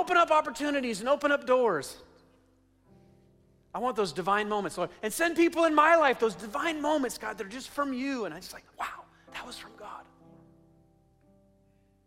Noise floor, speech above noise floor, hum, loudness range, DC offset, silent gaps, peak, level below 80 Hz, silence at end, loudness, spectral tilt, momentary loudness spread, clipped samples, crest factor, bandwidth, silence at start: -65 dBFS; 37 dB; none; 15 LU; under 0.1%; none; -10 dBFS; -64 dBFS; 2.05 s; -28 LUFS; -3.5 dB/octave; 20 LU; under 0.1%; 20 dB; 16 kHz; 0 s